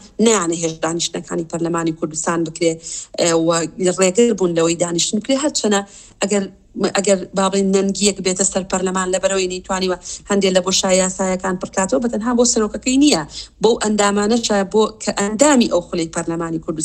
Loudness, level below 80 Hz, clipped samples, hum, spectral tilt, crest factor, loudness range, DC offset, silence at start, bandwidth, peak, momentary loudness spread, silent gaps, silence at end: -17 LUFS; -46 dBFS; under 0.1%; none; -3.5 dB/octave; 18 dB; 2 LU; under 0.1%; 0.05 s; 15 kHz; 0 dBFS; 7 LU; none; 0 s